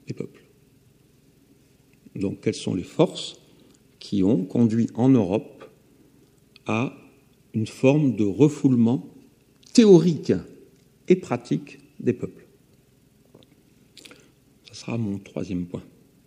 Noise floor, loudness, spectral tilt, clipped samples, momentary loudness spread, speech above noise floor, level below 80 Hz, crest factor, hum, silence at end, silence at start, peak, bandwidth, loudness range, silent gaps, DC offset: -58 dBFS; -22 LUFS; -7 dB/octave; under 0.1%; 18 LU; 37 dB; -64 dBFS; 22 dB; none; 0.45 s; 0.1 s; -2 dBFS; 11.5 kHz; 14 LU; none; under 0.1%